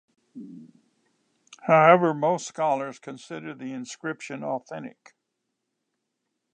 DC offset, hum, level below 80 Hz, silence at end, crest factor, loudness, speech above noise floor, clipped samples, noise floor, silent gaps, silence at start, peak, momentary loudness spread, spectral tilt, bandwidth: under 0.1%; none; -82 dBFS; 1.65 s; 26 dB; -24 LUFS; 56 dB; under 0.1%; -80 dBFS; none; 0.35 s; -2 dBFS; 25 LU; -5.5 dB/octave; 9.6 kHz